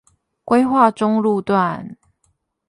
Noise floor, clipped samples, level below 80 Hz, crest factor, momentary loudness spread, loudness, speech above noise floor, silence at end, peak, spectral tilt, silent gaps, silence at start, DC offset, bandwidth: -66 dBFS; under 0.1%; -58 dBFS; 18 dB; 11 LU; -17 LUFS; 50 dB; 0.75 s; 0 dBFS; -7.5 dB/octave; none; 0.45 s; under 0.1%; 11.5 kHz